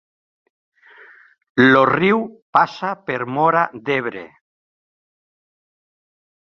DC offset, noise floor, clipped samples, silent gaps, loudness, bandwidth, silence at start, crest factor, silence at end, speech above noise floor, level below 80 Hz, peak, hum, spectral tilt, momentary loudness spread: under 0.1%; -47 dBFS; under 0.1%; 2.42-2.53 s; -17 LUFS; 6.8 kHz; 1.55 s; 20 dB; 2.3 s; 30 dB; -62 dBFS; 0 dBFS; none; -7 dB/octave; 12 LU